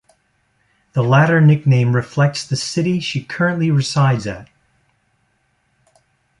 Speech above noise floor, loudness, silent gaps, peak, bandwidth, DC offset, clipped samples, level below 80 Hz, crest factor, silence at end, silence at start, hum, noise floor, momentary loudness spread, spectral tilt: 49 dB; -16 LUFS; none; -2 dBFS; 11 kHz; under 0.1%; under 0.1%; -54 dBFS; 16 dB; 1.95 s; 0.95 s; none; -64 dBFS; 10 LU; -6 dB/octave